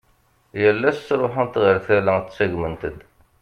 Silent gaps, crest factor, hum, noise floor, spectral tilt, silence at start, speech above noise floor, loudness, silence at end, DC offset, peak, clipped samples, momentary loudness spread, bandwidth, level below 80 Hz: none; 18 dB; none; -61 dBFS; -7.5 dB/octave; 0.55 s; 41 dB; -20 LUFS; 0.4 s; under 0.1%; -4 dBFS; under 0.1%; 11 LU; 8 kHz; -50 dBFS